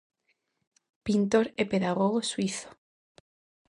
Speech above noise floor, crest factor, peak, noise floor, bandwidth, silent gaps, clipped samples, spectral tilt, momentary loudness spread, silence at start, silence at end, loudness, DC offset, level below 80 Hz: 49 dB; 20 dB; -10 dBFS; -76 dBFS; 11 kHz; none; under 0.1%; -5 dB/octave; 14 LU; 1.05 s; 0.95 s; -28 LUFS; under 0.1%; -64 dBFS